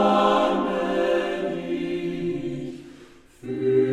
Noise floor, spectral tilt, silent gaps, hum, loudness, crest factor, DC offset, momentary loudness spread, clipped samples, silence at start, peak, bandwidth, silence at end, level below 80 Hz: -49 dBFS; -6.5 dB/octave; none; none; -24 LUFS; 18 dB; under 0.1%; 14 LU; under 0.1%; 0 s; -6 dBFS; 12 kHz; 0 s; -54 dBFS